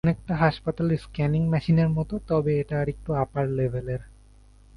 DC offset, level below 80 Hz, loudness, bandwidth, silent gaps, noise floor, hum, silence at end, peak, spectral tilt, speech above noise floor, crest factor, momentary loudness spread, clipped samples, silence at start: under 0.1%; -44 dBFS; -25 LUFS; 10 kHz; none; -52 dBFS; none; 0.7 s; -6 dBFS; -9 dB/octave; 28 dB; 18 dB; 6 LU; under 0.1%; 0.05 s